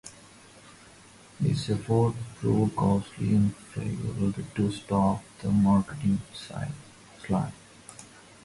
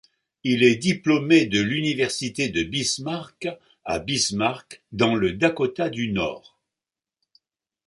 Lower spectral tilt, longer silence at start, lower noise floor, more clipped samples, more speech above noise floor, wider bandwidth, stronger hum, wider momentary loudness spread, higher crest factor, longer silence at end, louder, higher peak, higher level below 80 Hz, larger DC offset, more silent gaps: first, -7.5 dB/octave vs -4 dB/octave; second, 0.05 s vs 0.45 s; second, -52 dBFS vs -90 dBFS; neither; second, 26 dB vs 67 dB; about the same, 11.5 kHz vs 11.5 kHz; neither; first, 20 LU vs 14 LU; about the same, 16 dB vs 20 dB; second, 0.4 s vs 1.5 s; second, -28 LUFS vs -23 LUFS; second, -12 dBFS vs -4 dBFS; about the same, -52 dBFS vs -54 dBFS; neither; neither